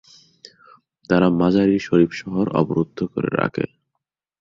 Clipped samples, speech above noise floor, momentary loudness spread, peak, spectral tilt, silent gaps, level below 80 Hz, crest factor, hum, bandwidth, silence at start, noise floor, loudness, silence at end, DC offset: under 0.1%; 61 dB; 8 LU; -2 dBFS; -8 dB/octave; none; -52 dBFS; 18 dB; none; 7.4 kHz; 1.1 s; -80 dBFS; -20 LUFS; 0.75 s; under 0.1%